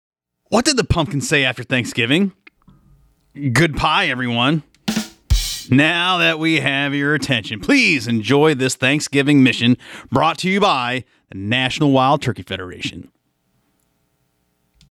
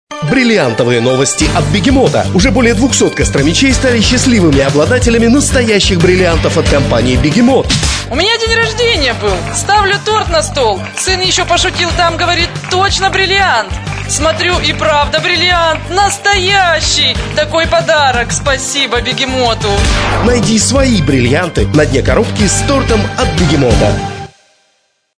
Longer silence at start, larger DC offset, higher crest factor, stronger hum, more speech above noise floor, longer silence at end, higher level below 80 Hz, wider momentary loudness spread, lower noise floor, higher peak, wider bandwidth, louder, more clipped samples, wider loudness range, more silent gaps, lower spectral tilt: first, 0.5 s vs 0.1 s; neither; first, 16 dB vs 10 dB; neither; about the same, 49 dB vs 48 dB; first, 1.9 s vs 0.9 s; second, -34 dBFS vs -22 dBFS; first, 10 LU vs 4 LU; first, -66 dBFS vs -58 dBFS; second, -4 dBFS vs 0 dBFS; first, 19 kHz vs 11 kHz; second, -17 LUFS vs -10 LUFS; neither; first, 5 LU vs 2 LU; neither; about the same, -4.5 dB/octave vs -4 dB/octave